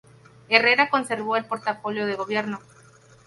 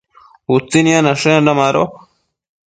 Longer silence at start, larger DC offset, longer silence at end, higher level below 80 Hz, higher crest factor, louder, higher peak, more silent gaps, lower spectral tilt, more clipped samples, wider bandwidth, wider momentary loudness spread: about the same, 0.5 s vs 0.5 s; neither; second, 0.65 s vs 0.8 s; second, -70 dBFS vs -54 dBFS; first, 24 dB vs 16 dB; second, -22 LUFS vs -13 LUFS; about the same, 0 dBFS vs 0 dBFS; neither; about the same, -4 dB/octave vs -5 dB/octave; neither; first, 11.5 kHz vs 9.4 kHz; first, 11 LU vs 7 LU